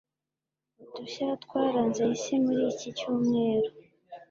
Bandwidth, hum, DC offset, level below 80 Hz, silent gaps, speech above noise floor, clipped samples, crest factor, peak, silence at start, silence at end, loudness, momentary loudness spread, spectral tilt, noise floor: 7.6 kHz; none; under 0.1%; -72 dBFS; none; 61 dB; under 0.1%; 16 dB; -14 dBFS; 0.8 s; 0.05 s; -28 LUFS; 14 LU; -5.5 dB/octave; -89 dBFS